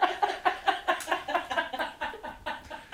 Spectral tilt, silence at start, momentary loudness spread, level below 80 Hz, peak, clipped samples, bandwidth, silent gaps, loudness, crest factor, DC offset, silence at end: -2 dB/octave; 0 s; 10 LU; -60 dBFS; -8 dBFS; under 0.1%; 16.5 kHz; none; -31 LUFS; 22 dB; under 0.1%; 0 s